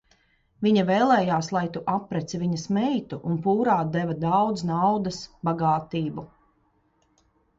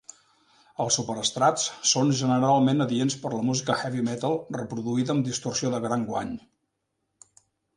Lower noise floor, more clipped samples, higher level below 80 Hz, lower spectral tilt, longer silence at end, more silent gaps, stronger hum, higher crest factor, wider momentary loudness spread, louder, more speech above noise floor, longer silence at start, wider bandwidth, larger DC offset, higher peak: second, -67 dBFS vs -79 dBFS; neither; first, -58 dBFS vs -64 dBFS; first, -6.5 dB/octave vs -4.5 dB/octave; about the same, 1.3 s vs 1.35 s; neither; neither; about the same, 18 dB vs 18 dB; about the same, 10 LU vs 10 LU; about the same, -25 LUFS vs -25 LUFS; second, 43 dB vs 53 dB; second, 0.6 s vs 0.8 s; second, 7.8 kHz vs 11.5 kHz; neither; about the same, -8 dBFS vs -8 dBFS